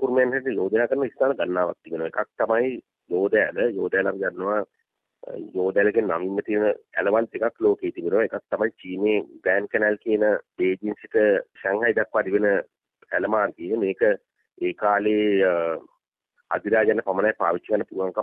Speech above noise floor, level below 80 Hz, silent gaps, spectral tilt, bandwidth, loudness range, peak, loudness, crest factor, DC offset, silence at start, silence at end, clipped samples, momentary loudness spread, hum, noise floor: 49 dB; -64 dBFS; 16.08-16.12 s; -9 dB/octave; 4.5 kHz; 2 LU; -6 dBFS; -23 LUFS; 16 dB; under 0.1%; 0 s; 0 s; under 0.1%; 8 LU; none; -72 dBFS